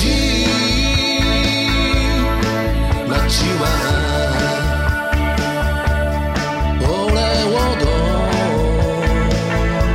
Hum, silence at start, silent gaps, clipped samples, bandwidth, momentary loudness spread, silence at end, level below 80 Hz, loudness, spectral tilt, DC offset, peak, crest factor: none; 0 s; none; under 0.1%; 16 kHz; 3 LU; 0 s; -20 dBFS; -17 LUFS; -5 dB/octave; under 0.1%; -4 dBFS; 12 dB